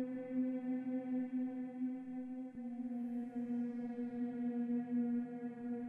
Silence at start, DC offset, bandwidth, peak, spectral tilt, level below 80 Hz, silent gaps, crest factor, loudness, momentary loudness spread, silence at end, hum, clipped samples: 0 s; under 0.1%; 3.4 kHz; -30 dBFS; -9 dB/octave; -82 dBFS; none; 12 dB; -41 LUFS; 7 LU; 0 s; none; under 0.1%